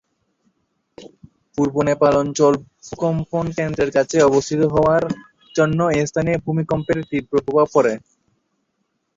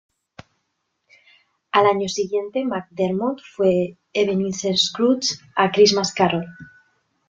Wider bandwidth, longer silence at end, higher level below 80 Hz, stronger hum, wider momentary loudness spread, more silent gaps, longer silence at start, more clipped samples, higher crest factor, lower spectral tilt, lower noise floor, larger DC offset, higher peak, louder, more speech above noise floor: about the same, 7.8 kHz vs 7.8 kHz; first, 1.2 s vs 0.6 s; first, -48 dBFS vs -62 dBFS; neither; about the same, 9 LU vs 9 LU; neither; second, 1 s vs 1.75 s; neither; about the same, 16 dB vs 20 dB; first, -6 dB/octave vs -4 dB/octave; about the same, -71 dBFS vs -74 dBFS; neither; about the same, -2 dBFS vs -2 dBFS; about the same, -19 LUFS vs -20 LUFS; about the same, 53 dB vs 54 dB